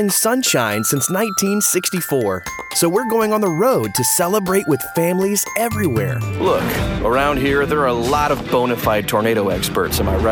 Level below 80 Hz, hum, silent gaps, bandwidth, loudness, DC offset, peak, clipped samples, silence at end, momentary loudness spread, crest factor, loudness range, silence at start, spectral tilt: -34 dBFS; none; none; over 20 kHz; -17 LUFS; under 0.1%; -2 dBFS; under 0.1%; 0 s; 4 LU; 14 dB; 1 LU; 0 s; -4 dB/octave